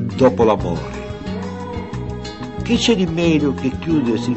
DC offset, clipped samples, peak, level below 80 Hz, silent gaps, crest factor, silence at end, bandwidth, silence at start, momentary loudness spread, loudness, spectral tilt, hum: 0.4%; under 0.1%; -2 dBFS; -36 dBFS; none; 16 dB; 0 s; 8.4 kHz; 0 s; 13 LU; -19 LUFS; -6 dB/octave; none